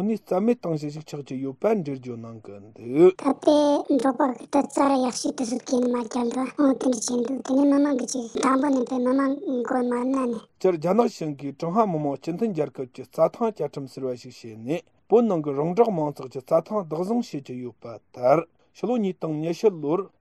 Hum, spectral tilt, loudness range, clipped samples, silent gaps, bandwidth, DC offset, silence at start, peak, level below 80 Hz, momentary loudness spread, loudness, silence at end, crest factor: none; -6 dB/octave; 4 LU; under 0.1%; none; 12.5 kHz; under 0.1%; 0 s; -6 dBFS; -70 dBFS; 14 LU; -24 LUFS; 0.15 s; 18 dB